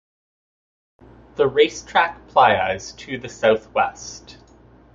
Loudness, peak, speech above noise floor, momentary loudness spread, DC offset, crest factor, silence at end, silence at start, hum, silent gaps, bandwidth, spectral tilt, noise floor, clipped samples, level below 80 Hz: -19 LUFS; -2 dBFS; 30 dB; 19 LU; under 0.1%; 20 dB; 0.75 s; 1.4 s; none; none; 7.6 kHz; -3.5 dB/octave; -49 dBFS; under 0.1%; -52 dBFS